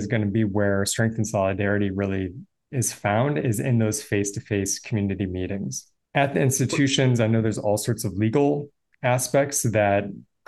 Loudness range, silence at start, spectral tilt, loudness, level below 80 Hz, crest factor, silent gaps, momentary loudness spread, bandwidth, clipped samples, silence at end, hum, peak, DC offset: 2 LU; 0 s; -5 dB/octave; -23 LUFS; -58 dBFS; 18 dB; none; 8 LU; 12.5 kHz; under 0.1%; 0.3 s; none; -6 dBFS; under 0.1%